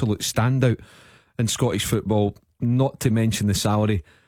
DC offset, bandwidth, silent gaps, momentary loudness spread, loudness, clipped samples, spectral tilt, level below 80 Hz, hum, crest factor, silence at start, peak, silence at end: under 0.1%; 17.5 kHz; none; 6 LU; -22 LUFS; under 0.1%; -5.5 dB/octave; -46 dBFS; none; 16 dB; 0 s; -6 dBFS; 0.25 s